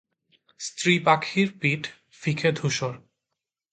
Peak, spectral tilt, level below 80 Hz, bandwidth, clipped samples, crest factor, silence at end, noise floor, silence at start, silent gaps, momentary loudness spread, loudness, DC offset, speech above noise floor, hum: -4 dBFS; -4.5 dB/octave; -66 dBFS; 9.4 kHz; under 0.1%; 22 dB; 0.75 s; -85 dBFS; 0.6 s; none; 15 LU; -24 LUFS; under 0.1%; 60 dB; none